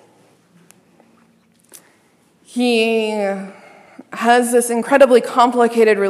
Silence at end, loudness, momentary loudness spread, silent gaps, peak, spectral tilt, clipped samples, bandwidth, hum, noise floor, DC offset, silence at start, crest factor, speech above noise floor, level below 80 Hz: 0 s; -15 LUFS; 16 LU; none; 0 dBFS; -3.5 dB/octave; under 0.1%; 14 kHz; none; -56 dBFS; under 0.1%; 2.55 s; 18 dB; 42 dB; -72 dBFS